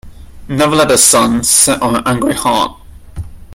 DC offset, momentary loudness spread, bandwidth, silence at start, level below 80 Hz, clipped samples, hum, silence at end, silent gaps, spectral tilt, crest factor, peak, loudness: under 0.1%; 17 LU; over 20 kHz; 0.05 s; -36 dBFS; 0.1%; none; 0 s; none; -3 dB/octave; 12 dB; 0 dBFS; -10 LUFS